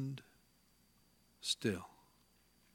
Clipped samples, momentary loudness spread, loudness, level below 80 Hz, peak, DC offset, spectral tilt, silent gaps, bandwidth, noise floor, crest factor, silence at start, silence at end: under 0.1%; 16 LU; -40 LUFS; -76 dBFS; -20 dBFS; under 0.1%; -4 dB/octave; none; 17.5 kHz; -72 dBFS; 24 dB; 0 s; 0.85 s